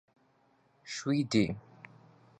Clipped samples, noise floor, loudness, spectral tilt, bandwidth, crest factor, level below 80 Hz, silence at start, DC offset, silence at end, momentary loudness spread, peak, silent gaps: under 0.1%; -69 dBFS; -32 LUFS; -5.5 dB/octave; 9.4 kHz; 22 dB; -64 dBFS; 0.85 s; under 0.1%; 0.8 s; 25 LU; -14 dBFS; none